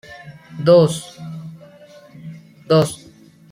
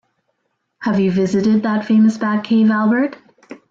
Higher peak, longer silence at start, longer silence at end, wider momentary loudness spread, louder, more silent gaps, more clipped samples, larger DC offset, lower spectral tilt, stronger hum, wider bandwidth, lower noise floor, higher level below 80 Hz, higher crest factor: first, -2 dBFS vs -6 dBFS; second, 0.1 s vs 0.8 s; first, 0.55 s vs 0.15 s; first, 25 LU vs 7 LU; about the same, -16 LUFS vs -16 LUFS; neither; neither; neither; about the same, -6.5 dB/octave vs -7.5 dB/octave; neither; first, 15.5 kHz vs 7.6 kHz; second, -46 dBFS vs -71 dBFS; about the same, -58 dBFS vs -58 dBFS; first, 18 dB vs 10 dB